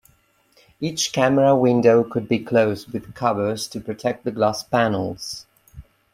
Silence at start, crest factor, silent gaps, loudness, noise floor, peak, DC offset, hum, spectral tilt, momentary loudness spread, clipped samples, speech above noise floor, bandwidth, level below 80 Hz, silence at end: 0.8 s; 18 dB; none; -20 LUFS; -60 dBFS; -2 dBFS; under 0.1%; none; -5 dB/octave; 14 LU; under 0.1%; 40 dB; 16 kHz; -56 dBFS; 0.35 s